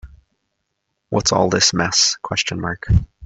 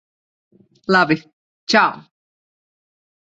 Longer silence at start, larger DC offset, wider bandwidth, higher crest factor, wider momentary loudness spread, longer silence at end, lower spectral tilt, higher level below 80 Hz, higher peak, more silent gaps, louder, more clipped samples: second, 0.05 s vs 0.9 s; neither; about the same, 8.4 kHz vs 8 kHz; about the same, 18 dB vs 20 dB; second, 8 LU vs 19 LU; second, 0 s vs 1.2 s; second, -3 dB/octave vs -4.5 dB/octave; first, -34 dBFS vs -64 dBFS; about the same, -2 dBFS vs -2 dBFS; second, none vs 1.33-1.67 s; about the same, -17 LUFS vs -17 LUFS; neither